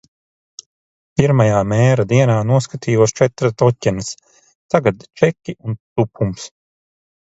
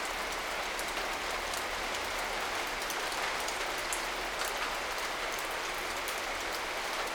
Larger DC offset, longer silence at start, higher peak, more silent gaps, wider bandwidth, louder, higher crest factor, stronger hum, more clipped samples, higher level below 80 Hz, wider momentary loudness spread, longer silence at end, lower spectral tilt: neither; first, 1.2 s vs 0 s; first, 0 dBFS vs -18 dBFS; first, 4.55-4.69 s, 5.80-5.96 s vs none; second, 8 kHz vs over 20 kHz; first, -17 LUFS vs -34 LUFS; about the same, 18 dB vs 18 dB; neither; neither; first, -46 dBFS vs -54 dBFS; first, 13 LU vs 2 LU; first, 0.75 s vs 0 s; first, -6.5 dB/octave vs -1 dB/octave